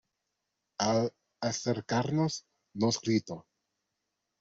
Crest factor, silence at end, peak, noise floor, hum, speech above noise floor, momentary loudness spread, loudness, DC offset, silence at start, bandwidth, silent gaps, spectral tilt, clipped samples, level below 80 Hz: 20 dB; 1 s; -14 dBFS; -84 dBFS; none; 54 dB; 16 LU; -31 LUFS; under 0.1%; 0.8 s; 8 kHz; none; -5 dB/octave; under 0.1%; -70 dBFS